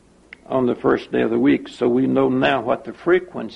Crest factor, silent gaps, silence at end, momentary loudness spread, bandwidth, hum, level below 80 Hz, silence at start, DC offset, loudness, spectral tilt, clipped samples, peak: 16 dB; none; 0 s; 5 LU; 8.8 kHz; none; -52 dBFS; 0.5 s; under 0.1%; -19 LUFS; -7.5 dB/octave; under 0.1%; -4 dBFS